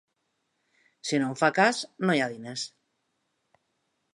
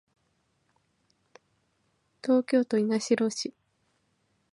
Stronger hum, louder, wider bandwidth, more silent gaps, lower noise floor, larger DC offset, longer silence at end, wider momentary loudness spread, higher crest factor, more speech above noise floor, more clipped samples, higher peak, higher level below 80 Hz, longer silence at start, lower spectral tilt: neither; about the same, -26 LUFS vs -27 LUFS; about the same, 11.5 kHz vs 11.5 kHz; neither; first, -77 dBFS vs -73 dBFS; neither; first, 1.45 s vs 1.05 s; about the same, 14 LU vs 12 LU; about the same, 24 dB vs 20 dB; about the same, 51 dB vs 48 dB; neither; first, -6 dBFS vs -12 dBFS; about the same, -82 dBFS vs -82 dBFS; second, 1.05 s vs 2.25 s; about the same, -4.5 dB/octave vs -4.5 dB/octave